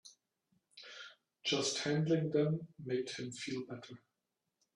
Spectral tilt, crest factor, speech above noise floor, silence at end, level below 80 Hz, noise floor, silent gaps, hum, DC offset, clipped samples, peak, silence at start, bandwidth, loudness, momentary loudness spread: -4.5 dB/octave; 18 dB; 51 dB; 0.8 s; -78 dBFS; -88 dBFS; none; none; under 0.1%; under 0.1%; -22 dBFS; 0.05 s; 11.5 kHz; -36 LUFS; 20 LU